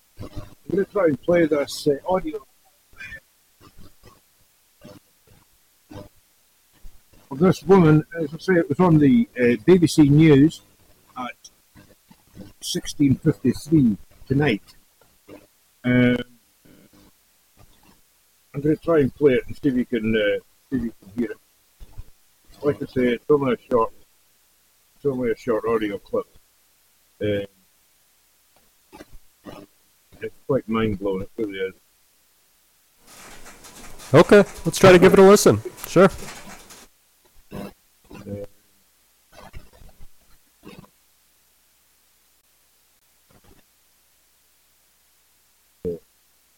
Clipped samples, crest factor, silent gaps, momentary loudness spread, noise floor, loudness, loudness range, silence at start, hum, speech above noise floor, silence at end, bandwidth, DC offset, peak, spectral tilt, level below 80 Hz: under 0.1%; 18 dB; none; 25 LU; -61 dBFS; -19 LUFS; 18 LU; 0.2 s; none; 43 dB; 0.6 s; 17 kHz; under 0.1%; -4 dBFS; -6.5 dB/octave; -48 dBFS